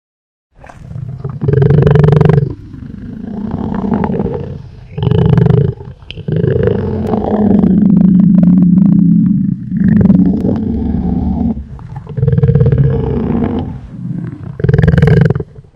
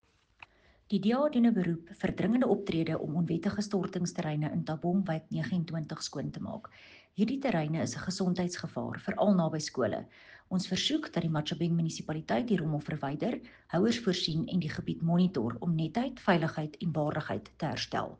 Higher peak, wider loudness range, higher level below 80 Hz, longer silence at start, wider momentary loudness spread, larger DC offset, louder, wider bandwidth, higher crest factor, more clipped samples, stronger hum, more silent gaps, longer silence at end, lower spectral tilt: first, 0 dBFS vs -12 dBFS; about the same, 6 LU vs 4 LU; first, -28 dBFS vs -62 dBFS; about the same, 0.8 s vs 0.9 s; first, 18 LU vs 9 LU; neither; first, -11 LUFS vs -32 LUFS; second, 5.2 kHz vs 9.4 kHz; second, 12 dB vs 18 dB; first, 0.3% vs under 0.1%; neither; neither; about the same, 0.15 s vs 0.05 s; first, -11 dB/octave vs -6 dB/octave